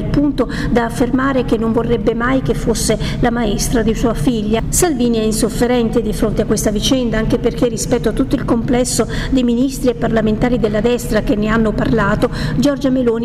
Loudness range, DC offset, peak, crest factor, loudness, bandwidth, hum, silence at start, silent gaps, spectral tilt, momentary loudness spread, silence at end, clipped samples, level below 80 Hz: 1 LU; 0.3%; -6 dBFS; 10 dB; -16 LUFS; 16 kHz; none; 0 s; none; -5 dB/octave; 2 LU; 0 s; under 0.1%; -26 dBFS